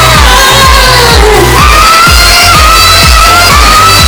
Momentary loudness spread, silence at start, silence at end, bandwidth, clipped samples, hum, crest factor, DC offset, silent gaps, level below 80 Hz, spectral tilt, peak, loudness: 2 LU; 0 s; 0 s; over 20 kHz; 30%; none; 2 dB; under 0.1%; none; -10 dBFS; -2.5 dB/octave; 0 dBFS; -1 LUFS